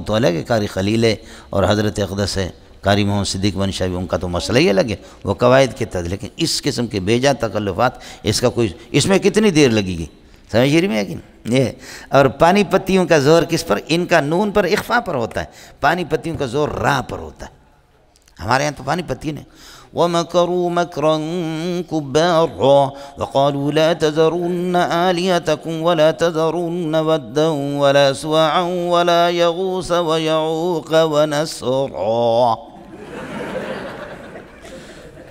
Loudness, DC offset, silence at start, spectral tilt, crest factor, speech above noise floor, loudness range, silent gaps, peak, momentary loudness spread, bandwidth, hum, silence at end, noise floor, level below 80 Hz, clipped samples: -17 LUFS; under 0.1%; 0 s; -5 dB/octave; 18 dB; 36 dB; 6 LU; none; 0 dBFS; 13 LU; 16 kHz; none; 0 s; -53 dBFS; -44 dBFS; under 0.1%